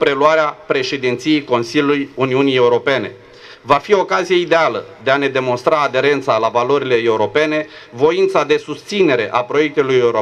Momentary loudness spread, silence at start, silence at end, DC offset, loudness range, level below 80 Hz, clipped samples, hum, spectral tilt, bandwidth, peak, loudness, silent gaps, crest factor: 5 LU; 0 s; 0 s; under 0.1%; 1 LU; -56 dBFS; under 0.1%; none; -5 dB/octave; 10.5 kHz; 0 dBFS; -15 LUFS; none; 14 dB